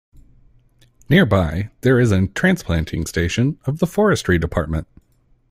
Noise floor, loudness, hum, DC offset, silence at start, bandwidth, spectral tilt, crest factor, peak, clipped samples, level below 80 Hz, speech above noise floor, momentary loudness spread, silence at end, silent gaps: -58 dBFS; -18 LUFS; none; under 0.1%; 1.1 s; 15.5 kHz; -6.5 dB/octave; 18 dB; -2 dBFS; under 0.1%; -38 dBFS; 40 dB; 8 LU; 0.7 s; none